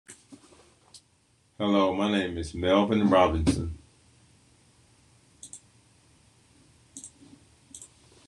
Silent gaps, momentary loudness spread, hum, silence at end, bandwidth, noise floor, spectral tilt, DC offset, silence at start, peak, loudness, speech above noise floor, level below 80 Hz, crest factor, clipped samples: none; 27 LU; none; 0.45 s; 11.5 kHz; -66 dBFS; -5.5 dB/octave; under 0.1%; 0.1 s; -6 dBFS; -25 LUFS; 41 dB; -50 dBFS; 24 dB; under 0.1%